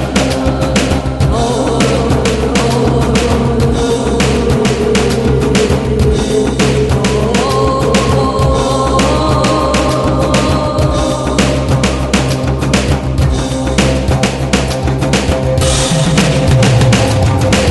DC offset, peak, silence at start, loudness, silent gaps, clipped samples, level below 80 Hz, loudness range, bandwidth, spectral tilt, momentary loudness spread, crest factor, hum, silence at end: 0.1%; 0 dBFS; 0 s; -12 LUFS; none; under 0.1%; -20 dBFS; 2 LU; 12 kHz; -5.5 dB/octave; 3 LU; 12 dB; none; 0 s